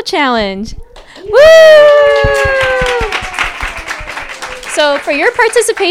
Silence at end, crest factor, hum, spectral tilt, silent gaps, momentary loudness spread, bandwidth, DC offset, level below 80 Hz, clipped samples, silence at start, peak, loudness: 0 s; 10 dB; none; -3 dB/octave; none; 19 LU; 15.5 kHz; under 0.1%; -30 dBFS; 1%; 0 s; 0 dBFS; -8 LUFS